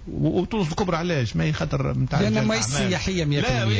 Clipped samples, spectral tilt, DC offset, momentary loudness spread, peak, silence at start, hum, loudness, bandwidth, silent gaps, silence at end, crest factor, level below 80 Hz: under 0.1%; -5.5 dB/octave; under 0.1%; 3 LU; -12 dBFS; 0 s; none; -23 LUFS; 8 kHz; none; 0 s; 12 dB; -38 dBFS